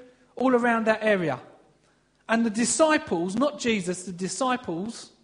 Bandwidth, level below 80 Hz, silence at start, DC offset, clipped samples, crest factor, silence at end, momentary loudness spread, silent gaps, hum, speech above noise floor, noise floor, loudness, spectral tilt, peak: 10.5 kHz; -64 dBFS; 0 s; under 0.1%; under 0.1%; 20 dB; 0.15 s; 11 LU; none; none; 40 dB; -64 dBFS; -25 LUFS; -4 dB/octave; -6 dBFS